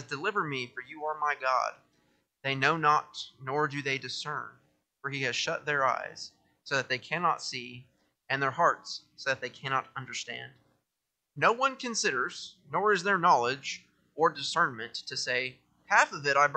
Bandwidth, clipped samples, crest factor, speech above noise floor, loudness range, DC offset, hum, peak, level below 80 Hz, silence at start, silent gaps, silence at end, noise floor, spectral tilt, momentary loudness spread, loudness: 9.2 kHz; under 0.1%; 22 dB; 55 dB; 4 LU; under 0.1%; none; -8 dBFS; -78 dBFS; 0 s; none; 0 s; -85 dBFS; -3 dB/octave; 14 LU; -30 LUFS